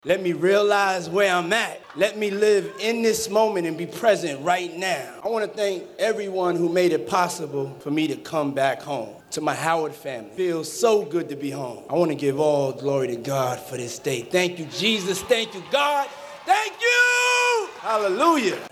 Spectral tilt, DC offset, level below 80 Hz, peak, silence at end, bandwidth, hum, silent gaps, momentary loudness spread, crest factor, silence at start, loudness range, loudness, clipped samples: -3.5 dB/octave; under 0.1%; -66 dBFS; -6 dBFS; 0.05 s; 14.5 kHz; none; none; 10 LU; 16 dB; 0.05 s; 4 LU; -23 LUFS; under 0.1%